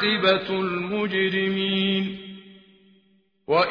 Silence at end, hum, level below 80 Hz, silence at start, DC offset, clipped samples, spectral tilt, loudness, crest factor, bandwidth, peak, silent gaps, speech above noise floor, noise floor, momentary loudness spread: 0 s; none; -62 dBFS; 0 s; under 0.1%; under 0.1%; -7 dB/octave; -23 LUFS; 18 dB; 5.4 kHz; -6 dBFS; none; 40 dB; -63 dBFS; 14 LU